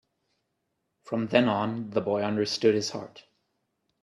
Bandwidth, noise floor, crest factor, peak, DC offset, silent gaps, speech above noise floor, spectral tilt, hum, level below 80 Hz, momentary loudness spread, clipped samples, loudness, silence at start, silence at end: 12 kHz; -79 dBFS; 24 dB; -6 dBFS; under 0.1%; none; 53 dB; -5 dB/octave; none; -72 dBFS; 10 LU; under 0.1%; -27 LUFS; 1.05 s; 0.85 s